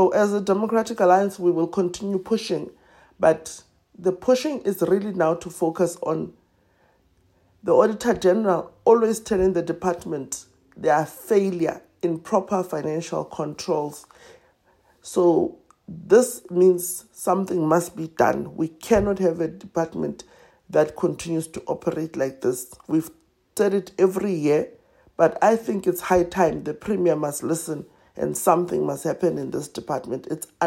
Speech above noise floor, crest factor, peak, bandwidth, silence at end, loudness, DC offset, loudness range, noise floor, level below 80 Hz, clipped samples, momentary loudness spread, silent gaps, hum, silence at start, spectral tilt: 40 dB; 20 dB; -4 dBFS; 16 kHz; 0 s; -23 LUFS; under 0.1%; 5 LU; -62 dBFS; -54 dBFS; under 0.1%; 11 LU; none; none; 0 s; -5.5 dB/octave